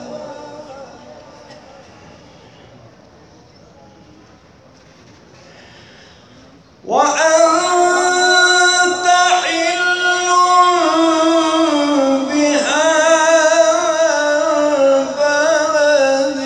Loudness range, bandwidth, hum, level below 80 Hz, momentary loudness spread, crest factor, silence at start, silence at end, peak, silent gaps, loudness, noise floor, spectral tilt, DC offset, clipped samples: 5 LU; 11.5 kHz; none; -60 dBFS; 5 LU; 14 dB; 0 s; 0 s; 0 dBFS; none; -13 LUFS; -45 dBFS; -1 dB/octave; under 0.1%; under 0.1%